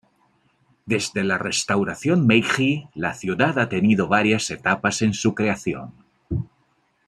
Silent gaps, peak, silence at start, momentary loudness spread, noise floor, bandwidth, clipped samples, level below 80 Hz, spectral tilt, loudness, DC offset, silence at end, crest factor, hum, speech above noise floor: none; -2 dBFS; 0.85 s; 12 LU; -65 dBFS; 13 kHz; under 0.1%; -52 dBFS; -5 dB/octave; -21 LUFS; under 0.1%; 0.65 s; 20 dB; none; 44 dB